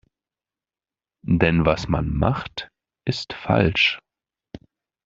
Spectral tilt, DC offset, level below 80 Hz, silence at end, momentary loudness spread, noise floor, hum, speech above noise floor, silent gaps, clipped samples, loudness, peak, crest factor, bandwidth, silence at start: -6.5 dB/octave; under 0.1%; -40 dBFS; 0.5 s; 16 LU; under -90 dBFS; none; over 69 dB; none; under 0.1%; -21 LUFS; -2 dBFS; 22 dB; 7.6 kHz; 1.25 s